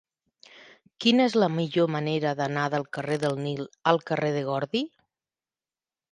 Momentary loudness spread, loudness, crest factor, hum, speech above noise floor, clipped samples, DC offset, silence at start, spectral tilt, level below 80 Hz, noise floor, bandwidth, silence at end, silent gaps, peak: 8 LU; -26 LUFS; 22 dB; none; over 65 dB; under 0.1%; under 0.1%; 0.55 s; -6 dB/octave; -72 dBFS; under -90 dBFS; 11.5 kHz; 1.25 s; none; -6 dBFS